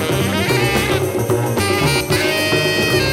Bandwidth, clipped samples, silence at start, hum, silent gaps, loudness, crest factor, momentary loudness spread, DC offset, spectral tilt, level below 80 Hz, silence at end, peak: 16.5 kHz; under 0.1%; 0 s; none; none; -16 LUFS; 14 dB; 3 LU; under 0.1%; -4.5 dB/octave; -38 dBFS; 0 s; -2 dBFS